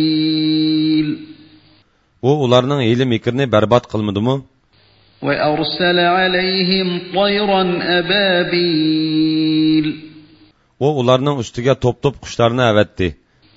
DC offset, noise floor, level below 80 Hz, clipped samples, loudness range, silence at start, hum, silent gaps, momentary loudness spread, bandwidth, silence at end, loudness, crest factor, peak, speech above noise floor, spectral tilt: under 0.1%; -55 dBFS; -46 dBFS; under 0.1%; 2 LU; 0 s; none; none; 7 LU; 7.8 kHz; 0.45 s; -16 LUFS; 16 dB; 0 dBFS; 40 dB; -6.5 dB/octave